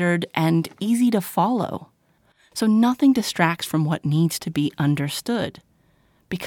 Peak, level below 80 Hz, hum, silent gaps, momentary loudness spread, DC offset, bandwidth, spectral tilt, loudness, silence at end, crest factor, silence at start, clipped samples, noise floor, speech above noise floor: -4 dBFS; -60 dBFS; none; none; 8 LU; under 0.1%; 19 kHz; -6 dB/octave; -21 LUFS; 0 s; 18 dB; 0 s; under 0.1%; -62 dBFS; 41 dB